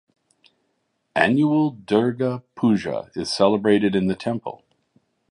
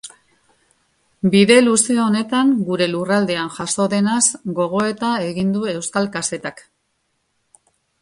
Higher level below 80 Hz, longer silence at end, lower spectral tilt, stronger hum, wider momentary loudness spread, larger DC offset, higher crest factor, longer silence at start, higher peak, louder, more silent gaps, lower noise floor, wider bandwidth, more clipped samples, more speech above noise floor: about the same, -58 dBFS vs -60 dBFS; second, 0.75 s vs 1.4 s; first, -6.5 dB/octave vs -4 dB/octave; neither; about the same, 10 LU vs 11 LU; neither; about the same, 20 dB vs 18 dB; first, 1.15 s vs 0.05 s; about the same, -2 dBFS vs 0 dBFS; second, -21 LUFS vs -17 LUFS; neither; about the same, -72 dBFS vs -69 dBFS; about the same, 11.5 kHz vs 11.5 kHz; neither; about the same, 51 dB vs 52 dB